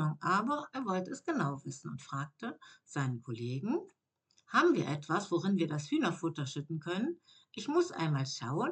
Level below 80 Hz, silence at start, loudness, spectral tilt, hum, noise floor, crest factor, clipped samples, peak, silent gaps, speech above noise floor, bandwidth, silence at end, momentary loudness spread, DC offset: -88 dBFS; 0 s; -35 LUFS; -6 dB/octave; none; -74 dBFS; 22 dB; under 0.1%; -14 dBFS; none; 40 dB; 8.8 kHz; 0 s; 12 LU; under 0.1%